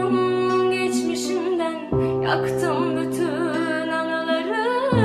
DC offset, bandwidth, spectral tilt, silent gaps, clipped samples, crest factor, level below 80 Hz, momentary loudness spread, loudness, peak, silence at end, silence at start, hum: under 0.1%; 14 kHz; -5.5 dB/octave; none; under 0.1%; 14 dB; -50 dBFS; 3 LU; -22 LUFS; -6 dBFS; 0 s; 0 s; none